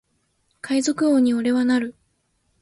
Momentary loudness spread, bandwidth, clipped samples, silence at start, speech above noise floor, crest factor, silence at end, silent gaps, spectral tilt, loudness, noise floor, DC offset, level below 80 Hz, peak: 11 LU; 11.5 kHz; under 0.1%; 0.65 s; 49 dB; 14 dB; 0.7 s; none; -4 dB/octave; -20 LUFS; -68 dBFS; under 0.1%; -64 dBFS; -10 dBFS